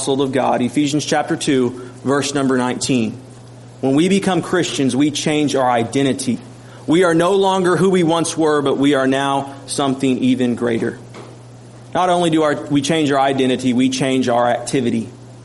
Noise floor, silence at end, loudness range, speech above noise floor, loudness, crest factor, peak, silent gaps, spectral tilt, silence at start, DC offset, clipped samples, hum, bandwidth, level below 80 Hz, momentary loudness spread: -38 dBFS; 0 s; 3 LU; 22 dB; -17 LUFS; 14 dB; -4 dBFS; none; -5 dB/octave; 0 s; under 0.1%; under 0.1%; none; 11.5 kHz; -56 dBFS; 8 LU